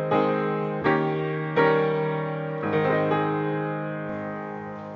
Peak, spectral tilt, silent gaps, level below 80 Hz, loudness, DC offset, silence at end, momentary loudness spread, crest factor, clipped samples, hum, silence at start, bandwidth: -8 dBFS; -9 dB/octave; none; -62 dBFS; -25 LUFS; under 0.1%; 0 s; 10 LU; 16 dB; under 0.1%; none; 0 s; 6.2 kHz